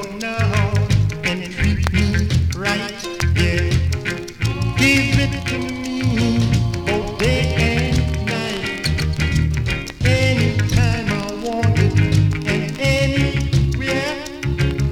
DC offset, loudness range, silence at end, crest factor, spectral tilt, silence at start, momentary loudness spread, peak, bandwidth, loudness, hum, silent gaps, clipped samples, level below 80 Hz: under 0.1%; 2 LU; 0 s; 18 dB; -5.5 dB/octave; 0 s; 7 LU; 0 dBFS; 16 kHz; -19 LUFS; none; none; under 0.1%; -28 dBFS